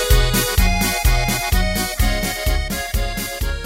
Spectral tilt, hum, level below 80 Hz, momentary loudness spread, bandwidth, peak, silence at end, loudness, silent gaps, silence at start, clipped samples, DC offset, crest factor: -3.5 dB/octave; none; -20 dBFS; 7 LU; 16.5 kHz; -2 dBFS; 0 s; -19 LUFS; none; 0 s; under 0.1%; under 0.1%; 16 dB